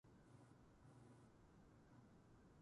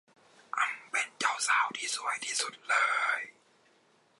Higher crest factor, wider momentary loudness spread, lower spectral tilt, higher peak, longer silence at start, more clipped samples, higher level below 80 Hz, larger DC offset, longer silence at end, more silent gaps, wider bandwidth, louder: second, 14 dB vs 20 dB; second, 2 LU vs 6 LU; first, -6.5 dB/octave vs 1.5 dB/octave; second, -54 dBFS vs -14 dBFS; second, 0.05 s vs 0.55 s; neither; first, -78 dBFS vs under -90 dBFS; neither; second, 0 s vs 0.9 s; neither; about the same, 11 kHz vs 11.5 kHz; second, -69 LUFS vs -30 LUFS